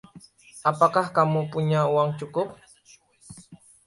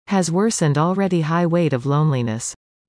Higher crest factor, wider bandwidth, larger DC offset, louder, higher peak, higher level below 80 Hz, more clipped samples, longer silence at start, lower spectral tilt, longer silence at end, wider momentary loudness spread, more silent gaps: first, 20 dB vs 14 dB; about the same, 11.5 kHz vs 10.5 kHz; neither; second, -24 LUFS vs -19 LUFS; about the same, -4 dBFS vs -6 dBFS; about the same, -64 dBFS vs -60 dBFS; neither; about the same, 0.15 s vs 0.1 s; about the same, -7 dB/octave vs -6 dB/octave; about the same, 0.3 s vs 0.35 s; first, 9 LU vs 6 LU; neither